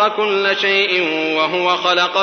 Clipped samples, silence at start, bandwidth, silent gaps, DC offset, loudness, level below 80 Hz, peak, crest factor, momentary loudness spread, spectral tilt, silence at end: under 0.1%; 0 s; 6.6 kHz; none; under 0.1%; -15 LUFS; -72 dBFS; -2 dBFS; 14 dB; 3 LU; -3 dB/octave; 0 s